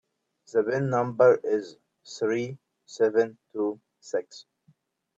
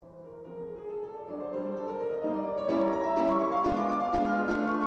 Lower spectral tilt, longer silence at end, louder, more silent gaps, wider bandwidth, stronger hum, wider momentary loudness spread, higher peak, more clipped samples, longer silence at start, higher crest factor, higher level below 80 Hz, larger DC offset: about the same, -6.5 dB/octave vs -7.5 dB/octave; first, 0.75 s vs 0 s; first, -26 LUFS vs -30 LUFS; neither; about the same, 7.8 kHz vs 8.2 kHz; neither; first, 23 LU vs 14 LU; first, -8 dBFS vs -16 dBFS; neither; first, 0.55 s vs 0.05 s; first, 20 dB vs 14 dB; second, -74 dBFS vs -56 dBFS; neither